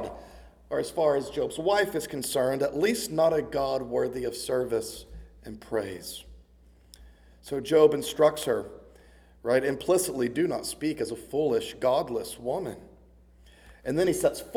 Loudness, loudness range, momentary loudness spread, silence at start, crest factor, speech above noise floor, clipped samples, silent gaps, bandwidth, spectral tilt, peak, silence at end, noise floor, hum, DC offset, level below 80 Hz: -27 LUFS; 6 LU; 15 LU; 0 s; 20 dB; 30 dB; under 0.1%; none; 19.5 kHz; -4.5 dB/octave; -8 dBFS; 0 s; -57 dBFS; none; under 0.1%; -54 dBFS